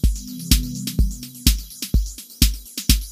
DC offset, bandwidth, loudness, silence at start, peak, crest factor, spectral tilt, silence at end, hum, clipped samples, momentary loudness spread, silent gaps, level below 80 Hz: under 0.1%; 15.5 kHz; -22 LUFS; 0.05 s; 0 dBFS; 20 dB; -3.5 dB/octave; 0 s; none; under 0.1%; 6 LU; none; -22 dBFS